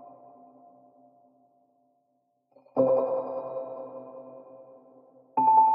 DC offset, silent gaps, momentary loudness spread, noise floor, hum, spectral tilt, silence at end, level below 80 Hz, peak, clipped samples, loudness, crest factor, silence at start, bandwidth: under 0.1%; none; 27 LU; -74 dBFS; none; -9 dB/octave; 0 s; -84 dBFS; -10 dBFS; under 0.1%; -27 LUFS; 20 dB; 0 s; 2.8 kHz